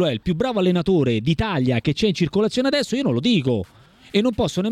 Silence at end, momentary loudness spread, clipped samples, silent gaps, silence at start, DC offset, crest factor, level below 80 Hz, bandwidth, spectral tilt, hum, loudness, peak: 0 s; 4 LU; under 0.1%; none; 0 s; under 0.1%; 14 dB; -42 dBFS; 13 kHz; -6.5 dB/octave; none; -20 LUFS; -6 dBFS